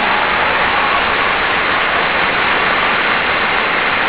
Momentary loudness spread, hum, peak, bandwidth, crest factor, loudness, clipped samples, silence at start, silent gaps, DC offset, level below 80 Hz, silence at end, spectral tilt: 1 LU; none; -2 dBFS; 4 kHz; 12 dB; -13 LUFS; under 0.1%; 0 s; none; 0.8%; -40 dBFS; 0 s; -6.5 dB/octave